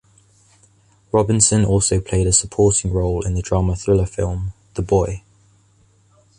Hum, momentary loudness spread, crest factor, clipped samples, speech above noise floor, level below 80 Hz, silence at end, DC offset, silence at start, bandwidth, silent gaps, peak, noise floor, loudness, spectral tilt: none; 11 LU; 20 dB; under 0.1%; 38 dB; -32 dBFS; 1.2 s; under 0.1%; 1.15 s; 11 kHz; none; 0 dBFS; -56 dBFS; -18 LUFS; -5 dB/octave